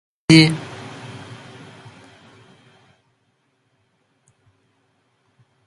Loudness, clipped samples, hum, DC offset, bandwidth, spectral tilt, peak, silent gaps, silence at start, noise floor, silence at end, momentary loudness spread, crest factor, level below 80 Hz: -14 LUFS; under 0.1%; none; under 0.1%; 11.5 kHz; -5.5 dB/octave; 0 dBFS; none; 0.3 s; -67 dBFS; 4.8 s; 29 LU; 24 dB; -58 dBFS